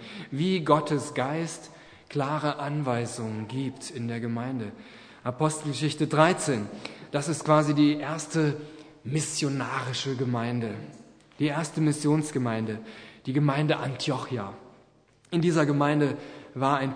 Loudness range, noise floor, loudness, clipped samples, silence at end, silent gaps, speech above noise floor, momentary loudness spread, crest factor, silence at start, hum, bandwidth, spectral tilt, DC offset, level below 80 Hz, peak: 6 LU; -60 dBFS; -27 LUFS; under 0.1%; 0 s; none; 34 dB; 15 LU; 22 dB; 0 s; none; 10.5 kHz; -5.5 dB/octave; under 0.1%; -70 dBFS; -4 dBFS